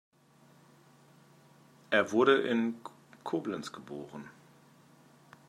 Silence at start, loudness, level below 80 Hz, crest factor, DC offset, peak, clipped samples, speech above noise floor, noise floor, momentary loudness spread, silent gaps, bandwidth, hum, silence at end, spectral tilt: 1.9 s; -30 LUFS; -82 dBFS; 24 dB; under 0.1%; -12 dBFS; under 0.1%; 32 dB; -62 dBFS; 22 LU; none; 13 kHz; none; 1.2 s; -5 dB/octave